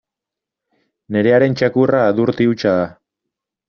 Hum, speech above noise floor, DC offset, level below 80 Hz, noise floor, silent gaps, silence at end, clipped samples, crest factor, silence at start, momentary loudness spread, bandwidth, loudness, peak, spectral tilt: none; 70 dB; under 0.1%; -56 dBFS; -85 dBFS; none; 0.8 s; under 0.1%; 14 dB; 1.1 s; 6 LU; 6.8 kHz; -16 LUFS; -2 dBFS; -6 dB/octave